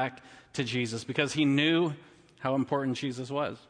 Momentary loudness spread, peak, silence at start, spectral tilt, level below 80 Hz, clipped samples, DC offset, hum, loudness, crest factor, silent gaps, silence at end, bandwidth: 10 LU; -12 dBFS; 0 s; -5 dB/octave; -70 dBFS; under 0.1%; under 0.1%; none; -30 LUFS; 18 dB; none; 0.1 s; 10.5 kHz